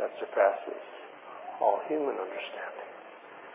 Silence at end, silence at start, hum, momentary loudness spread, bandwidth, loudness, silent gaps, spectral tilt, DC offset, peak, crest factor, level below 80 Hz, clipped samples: 0 s; 0 s; none; 20 LU; 3.8 kHz; -31 LUFS; none; -1 dB/octave; under 0.1%; -10 dBFS; 22 dB; under -90 dBFS; under 0.1%